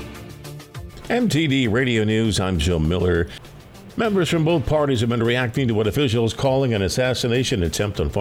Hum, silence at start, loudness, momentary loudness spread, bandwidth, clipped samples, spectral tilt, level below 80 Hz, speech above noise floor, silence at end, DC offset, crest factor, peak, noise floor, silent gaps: none; 0 s; -20 LUFS; 17 LU; 16.5 kHz; under 0.1%; -5.5 dB/octave; -36 dBFS; 22 dB; 0 s; under 0.1%; 14 dB; -6 dBFS; -41 dBFS; none